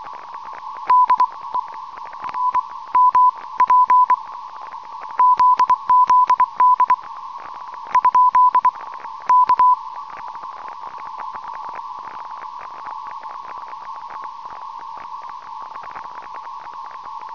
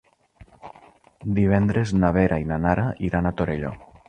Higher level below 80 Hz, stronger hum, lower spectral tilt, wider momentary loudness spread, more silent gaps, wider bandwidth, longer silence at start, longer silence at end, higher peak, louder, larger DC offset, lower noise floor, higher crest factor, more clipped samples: second, -66 dBFS vs -40 dBFS; neither; second, -2.5 dB/octave vs -8.5 dB/octave; first, 20 LU vs 8 LU; neither; second, 6 kHz vs 9.2 kHz; second, 0 s vs 0.65 s; second, 0 s vs 0.25 s; second, -8 dBFS vs -4 dBFS; first, -16 LUFS vs -22 LUFS; first, 0.4% vs under 0.1%; second, -34 dBFS vs -52 dBFS; second, 12 dB vs 20 dB; neither